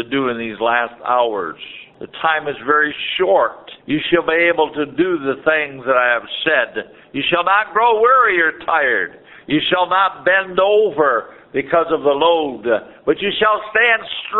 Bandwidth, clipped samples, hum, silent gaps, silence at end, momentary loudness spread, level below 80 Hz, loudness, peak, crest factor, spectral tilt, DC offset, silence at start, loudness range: 4.2 kHz; under 0.1%; none; none; 0 s; 8 LU; -56 dBFS; -16 LUFS; 0 dBFS; 16 dB; -1 dB/octave; under 0.1%; 0 s; 3 LU